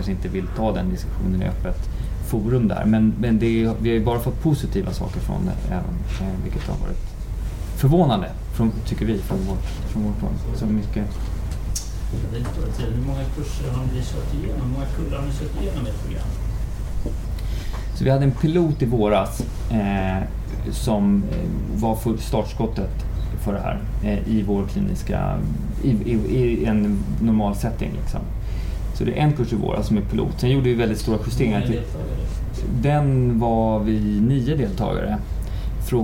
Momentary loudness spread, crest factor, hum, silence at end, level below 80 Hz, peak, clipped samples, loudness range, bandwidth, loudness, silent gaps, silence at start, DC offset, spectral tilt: 10 LU; 16 dB; none; 0 s; -28 dBFS; -4 dBFS; under 0.1%; 5 LU; 17 kHz; -23 LUFS; none; 0 s; under 0.1%; -7.5 dB/octave